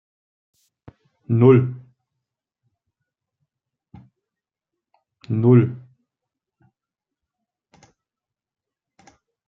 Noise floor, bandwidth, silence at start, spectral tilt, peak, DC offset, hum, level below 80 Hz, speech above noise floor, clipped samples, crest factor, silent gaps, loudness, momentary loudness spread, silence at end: -89 dBFS; 4.3 kHz; 1.3 s; -11 dB/octave; -2 dBFS; under 0.1%; none; -66 dBFS; 74 dB; under 0.1%; 22 dB; none; -17 LUFS; 20 LU; 3.7 s